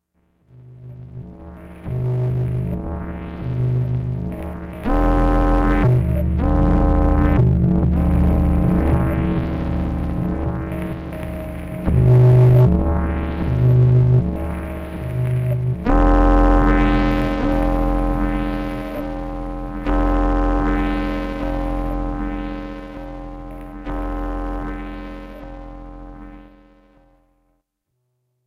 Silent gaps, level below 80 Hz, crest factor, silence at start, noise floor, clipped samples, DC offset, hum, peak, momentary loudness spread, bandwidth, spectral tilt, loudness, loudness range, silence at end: none; -24 dBFS; 12 dB; 0.6 s; -74 dBFS; under 0.1%; under 0.1%; none; -6 dBFS; 19 LU; 5.4 kHz; -9.5 dB/octave; -19 LUFS; 14 LU; 2.05 s